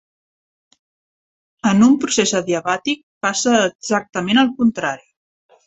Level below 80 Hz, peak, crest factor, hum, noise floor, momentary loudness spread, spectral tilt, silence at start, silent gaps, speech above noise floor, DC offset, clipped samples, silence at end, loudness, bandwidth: -60 dBFS; -2 dBFS; 18 dB; none; under -90 dBFS; 9 LU; -3.5 dB/octave; 1.65 s; 3.03-3.21 s, 3.75-3.79 s; over 73 dB; under 0.1%; under 0.1%; 0.7 s; -17 LUFS; 8.4 kHz